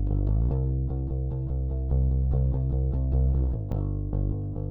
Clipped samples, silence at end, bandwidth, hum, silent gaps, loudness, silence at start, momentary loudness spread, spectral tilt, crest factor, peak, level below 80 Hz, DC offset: under 0.1%; 0 s; 1.5 kHz; none; none; -28 LUFS; 0 s; 5 LU; -13 dB/octave; 10 dB; -14 dBFS; -28 dBFS; under 0.1%